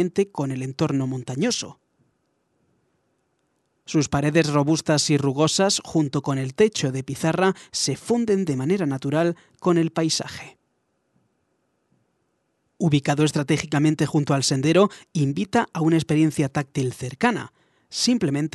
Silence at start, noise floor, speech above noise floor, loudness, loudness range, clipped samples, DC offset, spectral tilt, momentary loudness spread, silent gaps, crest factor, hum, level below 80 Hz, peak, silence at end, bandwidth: 0 s; -71 dBFS; 50 dB; -22 LUFS; 7 LU; under 0.1%; under 0.1%; -5 dB/octave; 7 LU; none; 18 dB; none; -60 dBFS; -4 dBFS; 0.05 s; 12.5 kHz